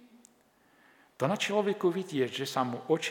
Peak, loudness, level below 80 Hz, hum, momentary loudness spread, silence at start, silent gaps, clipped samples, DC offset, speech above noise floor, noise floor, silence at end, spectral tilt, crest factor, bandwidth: -14 dBFS; -31 LUFS; -84 dBFS; none; 4 LU; 1.2 s; none; under 0.1%; under 0.1%; 36 dB; -65 dBFS; 0 s; -5 dB/octave; 18 dB; 18.5 kHz